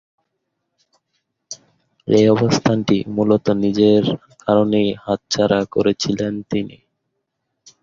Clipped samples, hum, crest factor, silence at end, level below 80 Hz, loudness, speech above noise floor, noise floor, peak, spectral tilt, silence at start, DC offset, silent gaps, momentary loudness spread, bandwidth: under 0.1%; none; 18 dB; 1.15 s; -52 dBFS; -17 LUFS; 58 dB; -75 dBFS; -2 dBFS; -6 dB/octave; 1.5 s; under 0.1%; none; 16 LU; 7.6 kHz